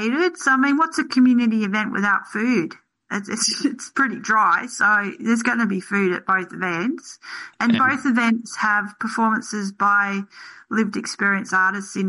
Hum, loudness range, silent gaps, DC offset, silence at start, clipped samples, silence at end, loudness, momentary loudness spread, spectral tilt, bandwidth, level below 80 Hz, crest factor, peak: none; 2 LU; none; under 0.1%; 0 s; under 0.1%; 0 s; -20 LUFS; 9 LU; -4 dB/octave; 11.5 kHz; -70 dBFS; 14 dB; -8 dBFS